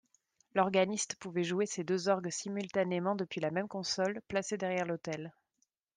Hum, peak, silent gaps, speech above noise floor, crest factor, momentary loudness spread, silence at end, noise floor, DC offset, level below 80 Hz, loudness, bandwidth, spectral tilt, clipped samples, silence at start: none; -14 dBFS; none; 47 dB; 20 dB; 7 LU; 0.65 s; -80 dBFS; under 0.1%; -76 dBFS; -34 LUFS; 10 kHz; -4.5 dB/octave; under 0.1%; 0.55 s